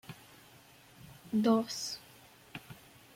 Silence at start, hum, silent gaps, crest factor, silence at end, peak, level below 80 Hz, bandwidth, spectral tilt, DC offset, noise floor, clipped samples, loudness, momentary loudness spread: 0.1 s; none; none; 22 dB; 0.4 s; -16 dBFS; -74 dBFS; 16.5 kHz; -4.5 dB/octave; under 0.1%; -59 dBFS; under 0.1%; -33 LUFS; 27 LU